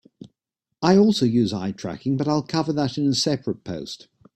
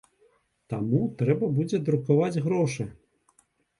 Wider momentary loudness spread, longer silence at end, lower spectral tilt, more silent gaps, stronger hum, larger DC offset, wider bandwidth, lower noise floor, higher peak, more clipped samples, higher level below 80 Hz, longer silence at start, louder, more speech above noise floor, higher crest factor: first, 15 LU vs 10 LU; second, 0.4 s vs 0.85 s; second, -6 dB/octave vs -8 dB/octave; neither; neither; neither; first, 12.5 kHz vs 11 kHz; first, -82 dBFS vs -66 dBFS; first, -4 dBFS vs -10 dBFS; neither; about the same, -58 dBFS vs -62 dBFS; second, 0.2 s vs 0.7 s; first, -22 LUFS vs -26 LUFS; first, 61 dB vs 41 dB; about the same, 20 dB vs 16 dB